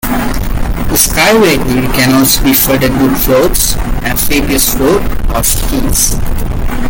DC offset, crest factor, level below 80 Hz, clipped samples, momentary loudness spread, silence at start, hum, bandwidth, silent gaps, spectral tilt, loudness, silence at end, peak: under 0.1%; 10 dB; -16 dBFS; under 0.1%; 10 LU; 0.05 s; none; 17.5 kHz; none; -3.5 dB/octave; -10 LUFS; 0 s; 0 dBFS